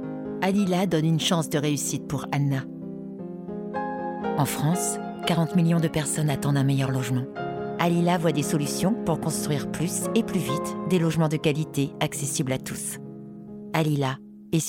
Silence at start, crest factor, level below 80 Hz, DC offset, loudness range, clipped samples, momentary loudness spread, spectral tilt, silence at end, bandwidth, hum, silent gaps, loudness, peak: 0 s; 18 dB; -58 dBFS; under 0.1%; 4 LU; under 0.1%; 10 LU; -5.5 dB/octave; 0 s; 17 kHz; none; none; -25 LUFS; -8 dBFS